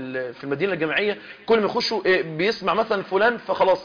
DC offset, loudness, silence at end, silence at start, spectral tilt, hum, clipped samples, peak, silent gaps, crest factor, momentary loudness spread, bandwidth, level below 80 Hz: under 0.1%; -22 LUFS; 0 s; 0 s; -5 dB/octave; none; under 0.1%; -8 dBFS; none; 14 dB; 8 LU; 5.4 kHz; -60 dBFS